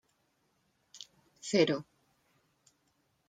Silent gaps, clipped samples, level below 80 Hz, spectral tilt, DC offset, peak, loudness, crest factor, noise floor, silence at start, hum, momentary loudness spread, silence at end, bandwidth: none; under 0.1%; -82 dBFS; -4.5 dB/octave; under 0.1%; -14 dBFS; -31 LUFS; 24 dB; -76 dBFS; 0.95 s; none; 22 LU; 1.45 s; 9.6 kHz